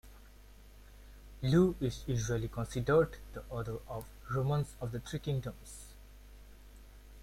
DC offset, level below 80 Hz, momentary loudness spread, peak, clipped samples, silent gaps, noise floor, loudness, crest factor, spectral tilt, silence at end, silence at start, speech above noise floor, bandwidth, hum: under 0.1%; -50 dBFS; 20 LU; -16 dBFS; under 0.1%; none; -55 dBFS; -34 LUFS; 20 dB; -6.5 dB/octave; 0 s; 0.05 s; 22 dB; 16.5 kHz; 50 Hz at -50 dBFS